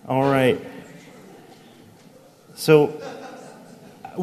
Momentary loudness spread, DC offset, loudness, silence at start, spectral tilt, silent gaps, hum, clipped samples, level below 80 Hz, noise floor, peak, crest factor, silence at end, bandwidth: 26 LU; under 0.1%; -19 LUFS; 0.05 s; -6 dB/octave; none; none; under 0.1%; -62 dBFS; -50 dBFS; -2 dBFS; 22 dB; 0 s; 14 kHz